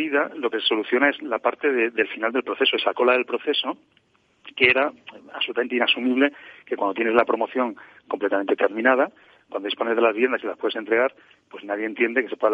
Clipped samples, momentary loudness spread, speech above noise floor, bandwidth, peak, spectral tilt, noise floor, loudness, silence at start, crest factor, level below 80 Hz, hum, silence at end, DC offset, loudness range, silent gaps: under 0.1%; 9 LU; 27 dB; 5 kHz; -2 dBFS; -5.5 dB/octave; -49 dBFS; -22 LUFS; 0 s; 22 dB; -70 dBFS; none; 0 s; under 0.1%; 2 LU; none